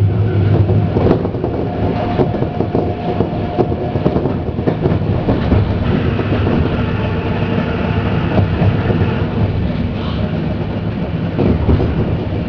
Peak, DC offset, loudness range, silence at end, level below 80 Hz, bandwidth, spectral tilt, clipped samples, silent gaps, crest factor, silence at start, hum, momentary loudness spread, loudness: 0 dBFS; under 0.1%; 1 LU; 0 s; -26 dBFS; 5.4 kHz; -10 dB/octave; under 0.1%; none; 14 dB; 0 s; none; 5 LU; -16 LUFS